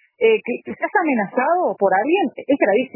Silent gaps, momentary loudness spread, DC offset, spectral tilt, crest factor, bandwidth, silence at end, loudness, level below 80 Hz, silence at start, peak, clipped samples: none; 4 LU; under 0.1%; -9.5 dB/octave; 14 dB; 3.1 kHz; 0.1 s; -19 LUFS; -70 dBFS; 0.2 s; -4 dBFS; under 0.1%